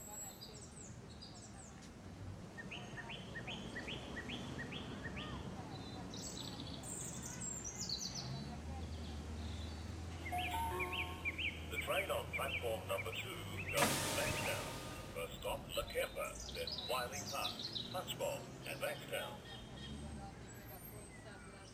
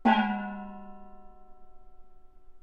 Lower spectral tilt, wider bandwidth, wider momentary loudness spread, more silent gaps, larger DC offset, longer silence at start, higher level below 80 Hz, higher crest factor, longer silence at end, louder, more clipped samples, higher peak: second, -3.5 dB/octave vs -7 dB/octave; first, 19 kHz vs 6.2 kHz; second, 13 LU vs 27 LU; neither; neither; about the same, 0 s vs 0 s; about the same, -56 dBFS vs -56 dBFS; about the same, 24 dB vs 22 dB; about the same, 0 s vs 0 s; second, -43 LUFS vs -30 LUFS; neither; second, -20 dBFS vs -10 dBFS